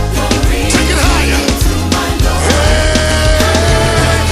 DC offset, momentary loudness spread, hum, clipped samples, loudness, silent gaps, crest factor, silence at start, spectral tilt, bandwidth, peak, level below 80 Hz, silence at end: under 0.1%; 3 LU; none; under 0.1%; -11 LUFS; none; 10 dB; 0 s; -4 dB/octave; 15.5 kHz; 0 dBFS; -16 dBFS; 0 s